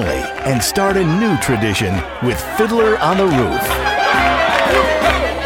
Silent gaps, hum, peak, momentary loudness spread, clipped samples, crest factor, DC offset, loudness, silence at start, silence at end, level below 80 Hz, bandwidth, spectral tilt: none; none; 0 dBFS; 6 LU; under 0.1%; 14 dB; under 0.1%; -15 LUFS; 0 s; 0 s; -32 dBFS; 17 kHz; -4.5 dB/octave